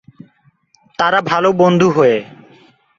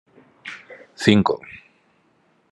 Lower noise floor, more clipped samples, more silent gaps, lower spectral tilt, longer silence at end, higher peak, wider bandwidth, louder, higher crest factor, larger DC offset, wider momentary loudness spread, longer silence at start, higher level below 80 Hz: second, -55 dBFS vs -62 dBFS; neither; neither; about the same, -6 dB/octave vs -6 dB/octave; second, 0.65 s vs 0.95 s; about the same, -2 dBFS vs 0 dBFS; second, 7.4 kHz vs 11.5 kHz; first, -13 LUFS vs -19 LUFS; second, 14 dB vs 24 dB; neither; second, 8 LU vs 26 LU; first, 1 s vs 0.45 s; first, -56 dBFS vs -62 dBFS